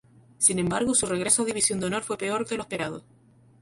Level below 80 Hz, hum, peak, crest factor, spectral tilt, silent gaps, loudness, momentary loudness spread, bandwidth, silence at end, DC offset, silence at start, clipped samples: -58 dBFS; none; -6 dBFS; 20 dB; -3 dB/octave; none; -25 LUFS; 10 LU; 12 kHz; 0.6 s; under 0.1%; 0.4 s; under 0.1%